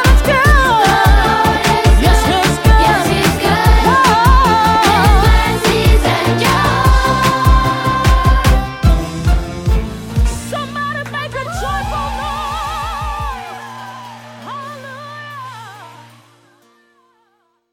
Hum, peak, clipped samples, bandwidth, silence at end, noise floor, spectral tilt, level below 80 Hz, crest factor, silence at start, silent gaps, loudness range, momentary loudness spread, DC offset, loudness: none; 0 dBFS; under 0.1%; 17 kHz; 1.8 s; -61 dBFS; -5 dB/octave; -16 dBFS; 12 dB; 0 s; none; 18 LU; 19 LU; under 0.1%; -13 LUFS